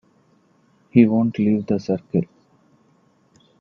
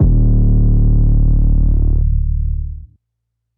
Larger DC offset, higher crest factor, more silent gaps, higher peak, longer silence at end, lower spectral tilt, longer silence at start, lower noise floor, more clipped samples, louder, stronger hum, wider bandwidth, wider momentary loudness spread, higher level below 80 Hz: neither; first, 22 dB vs 10 dB; neither; first, 0 dBFS vs -4 dBFS; first, 1.35 s vs 0.7 s; second, -9.5 dB/octave vs -17 dB/octave; first, 0.95 s vs 0 s; second, -59 dBFS vs -73 dBFS; neither; second, -20 LUFS vs -16 LUFS; neither; first, 6.4 kHz vs 1.1 kHz; about the same, 9 LU vs 10 LU; second, -60 dBFS vs -14 dBFS